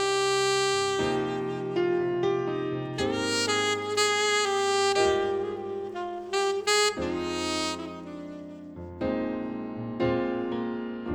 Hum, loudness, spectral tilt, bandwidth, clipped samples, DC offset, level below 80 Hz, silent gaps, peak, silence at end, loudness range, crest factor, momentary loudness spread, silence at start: none; -27 LUFS; -3.5 dB/octave; 17.5 kHz; under 0.1%; under 0.1%; -56 dBFS; none; -12 dBFS; 0 s; 6 LU; 16 dB; 12 LU; 0 s